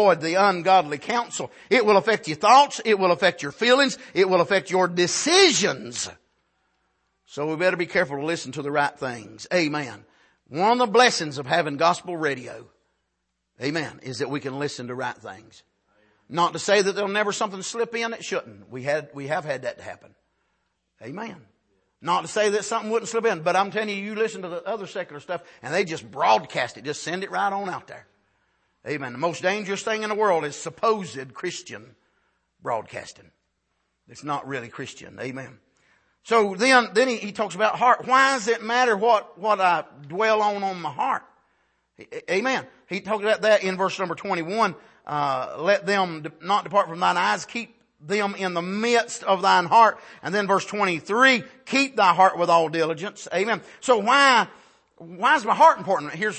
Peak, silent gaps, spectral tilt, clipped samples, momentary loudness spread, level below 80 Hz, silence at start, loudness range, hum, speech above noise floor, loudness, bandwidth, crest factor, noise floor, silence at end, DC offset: -2 dBFS; none; -3.5 dB/octave; under 0.1%; 16 LU; -72 dBFS; 0 s; 11 LU; none; 54 dB; -22 LUFS; 8.8 kHz; 22 dB; -77 dBFS; 0 s; under 0.1%